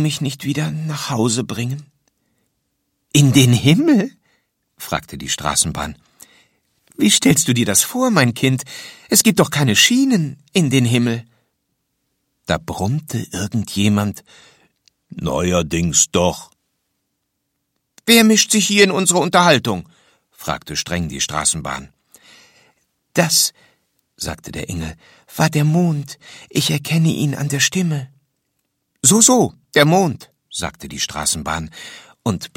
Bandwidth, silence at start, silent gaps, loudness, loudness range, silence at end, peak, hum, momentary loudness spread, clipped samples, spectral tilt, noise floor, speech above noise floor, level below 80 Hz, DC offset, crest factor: 16.5 kHz; 0 s; none; -16 LUFS; 7 LU; 0.1 s; 0 dBFS; none; 16 LU; under 0.1%; -3.5 dB/octave; -73 dBFS; 56 dB; -46 dBFS; under 0.1%; 18 dB